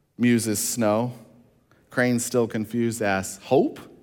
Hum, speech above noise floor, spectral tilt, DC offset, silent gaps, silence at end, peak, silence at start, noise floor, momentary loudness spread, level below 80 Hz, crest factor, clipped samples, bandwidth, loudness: none; 36 dB; -4.5 dB/octave; under 0.1%; none; 0.15 s; -6 dBFS; 0.2 s; -59 dBFS; 6 LU; -66 dBFS; 18 dB; under 0.1%; 18 kHz; -24 LUFS